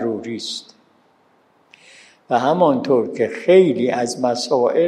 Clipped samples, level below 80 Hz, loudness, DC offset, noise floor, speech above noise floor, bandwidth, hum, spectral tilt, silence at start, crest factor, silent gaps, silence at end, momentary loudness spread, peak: under 0.1%; -72 dBFS; -18 LUFS; under 0.1%; -57 dBFS; 41 dB; 11 kHz; none; -5.5 dB/octave; 0 s; 18 dB; none; 0 s; 13 LU; -2 dBFS